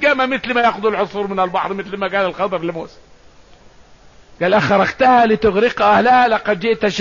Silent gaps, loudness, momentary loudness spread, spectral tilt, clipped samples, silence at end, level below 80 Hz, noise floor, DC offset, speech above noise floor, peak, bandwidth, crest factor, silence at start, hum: none; -15 LUFS; 10 LU; -5.5 dB/octave; under 0.1%; 0 s; -48 dBFS; -46 dBFS; 0.3%; 30 dB; -4 dBFS; 7.4 kHz; 12 dB; 0 s; none